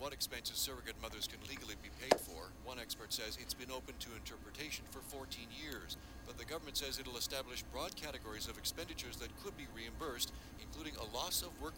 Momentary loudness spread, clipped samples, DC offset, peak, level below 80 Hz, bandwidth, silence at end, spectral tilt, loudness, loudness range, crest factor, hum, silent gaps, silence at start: 10 LU; under 0.1%; under 0.1%; -14 dBFS; -56 dBFS; 19.5 kHz; 0 s; -2 dB/octave; -43 LUFS; 4 LU; 30 dB; none; none; 0 s